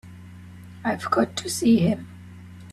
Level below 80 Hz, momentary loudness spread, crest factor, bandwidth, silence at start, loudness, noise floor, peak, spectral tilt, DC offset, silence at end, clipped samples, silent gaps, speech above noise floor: -60 dBFS; 24 LU; 18 dB; 13.5 kHz; 0.05 s; -23 LUFS; -42 dBFS; -6 dBFS; -5.5 dB/octave; under 0.1%; 0 s; under 0.1%; none; 21 dB